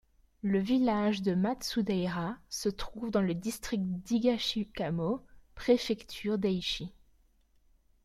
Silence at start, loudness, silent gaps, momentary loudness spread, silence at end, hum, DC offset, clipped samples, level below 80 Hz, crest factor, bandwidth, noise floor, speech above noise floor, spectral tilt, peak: 0.45 s; -32 LUFS; none; 9 LU; 1.15 s; none; under 0.1%; under 0.1%; -56 dBFS; 18 dB; 15 kHz; -67 dBFS; 36 dB; -5.5 dB/octave; -14 dBFS